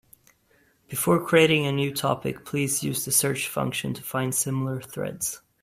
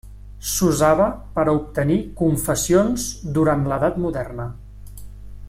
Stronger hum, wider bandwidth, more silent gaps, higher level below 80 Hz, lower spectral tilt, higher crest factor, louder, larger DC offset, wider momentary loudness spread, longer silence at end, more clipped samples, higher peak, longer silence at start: second, none vs 50 Hz at -35 dBFS; about the same, 16 kHz vs 16.5 kHz; neither; second, -60 dBFS vs -38 dBFS; second, -4 dB/octave vs -5.5 dB/octave; about the same, 20 dB vs 18 dB; second, -25 LUFS vs -20 LUFS; neither; second, 11 LU vs 14 LU; first, 0.25 s vs 0 s; neither; about the same, -6 dBFS vs -4 dBFS; first, 0.9 s vs 0.05 s